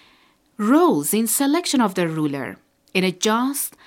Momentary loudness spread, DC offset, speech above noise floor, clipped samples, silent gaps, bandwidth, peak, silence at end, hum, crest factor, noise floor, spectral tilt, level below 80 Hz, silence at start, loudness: 9 LU; under 0.1%; 38 dB; under 0.1%; none; 17 kHz; -4 dBFS; 0.2 s; none; 18 dB; -58 dBFS; -4 dB/octave; -70 dBFS; 0.6 s; -20 LUFS